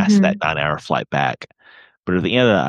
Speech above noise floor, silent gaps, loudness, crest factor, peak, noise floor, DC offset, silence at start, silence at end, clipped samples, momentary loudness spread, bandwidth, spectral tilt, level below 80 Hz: 32 dB; 1.97-2.03 s; -18 LUFS; 16 dB; -2 dBFS; -49 dBFS; under 0.1%; 0 s; 0 s; under 0.1%; 17 LU; 9.2 kHz; -6 dB/octave; -50 dBFS